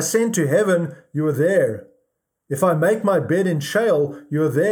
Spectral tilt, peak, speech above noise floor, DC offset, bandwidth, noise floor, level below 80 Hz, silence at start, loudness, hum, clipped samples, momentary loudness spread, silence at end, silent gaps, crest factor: -5.5 dB/octave; -6 dBFS; 54 dB; under 0.1%; 20 kHz; -73 dBFS; -70 dBFS; 0 s; -20 LUFS; none; under 0.1%; 6 LU; 0 s; none; 14 dB